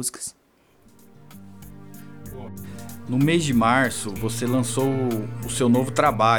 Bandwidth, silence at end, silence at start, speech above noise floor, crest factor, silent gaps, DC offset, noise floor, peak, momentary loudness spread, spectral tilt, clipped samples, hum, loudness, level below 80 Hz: over 20 kHz; 0 s; 0 s; 35 dB; 18 dB; none; 0.7%; -57 dBFS; -4 dBFS; 24 LU; -5 dB/octave; under 0.1%; none; -22 LUFS; -50 dBFS